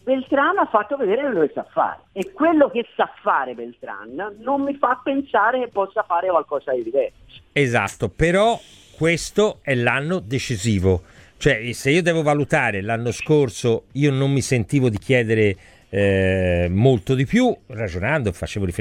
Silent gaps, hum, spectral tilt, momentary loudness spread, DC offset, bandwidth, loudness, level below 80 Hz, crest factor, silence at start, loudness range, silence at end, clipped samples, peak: none; none; -6 dB/octave; 8 LU; under 0.1%; 15.5 kHz; -20 LUFS; -44 dBFS; 18 dB; 0.05 s; 3 LU; 0 s; under 0.1%; -2 dBFS